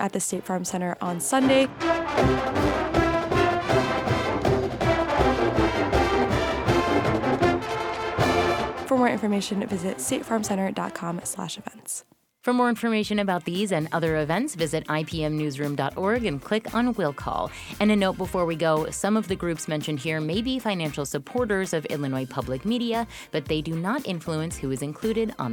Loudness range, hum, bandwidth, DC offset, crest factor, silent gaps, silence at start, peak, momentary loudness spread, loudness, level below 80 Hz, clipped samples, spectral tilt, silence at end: 5 LU; none; 19 kHz; under 0.1%; 18 dB; none; 0 s; -8 dBFS; 7 LU; -25 LUFS; -42 dBFS; under 0.1%; -5 dB/octave; 0 s